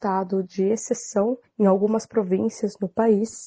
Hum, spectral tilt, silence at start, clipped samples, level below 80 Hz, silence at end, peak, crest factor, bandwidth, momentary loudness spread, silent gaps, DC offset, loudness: none; -6.5 dB/octave; 0 s; under 0.1%; -64 dBFS; 0 s; -6 dBFS; 16 dB; 9.6 kHz; 6 LU; none; under 0.1%; -23 LUFS